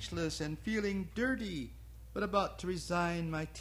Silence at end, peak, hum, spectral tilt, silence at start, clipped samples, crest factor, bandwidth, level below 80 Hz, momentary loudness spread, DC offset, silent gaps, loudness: 0 s; -18 dBFS; none; -5.5 dB/octave; 0 s; under 0.1%; 18 dB; 16 kHz; -52 dBFS; 9 LU; under 0.1%; none; -36 LUFS